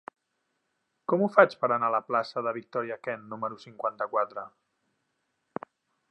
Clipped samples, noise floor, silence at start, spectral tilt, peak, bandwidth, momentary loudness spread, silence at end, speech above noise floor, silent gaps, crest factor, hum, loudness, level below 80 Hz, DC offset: under 0.1%; -79 dBFS; 1.1 s; -7 dB/octave; -4 dBFS; 8.4 kHz; 20 LU; 1.6 s; 51 dB; none; 26 dB; none; -28 LUFS; -84 dBFS; under 0.1%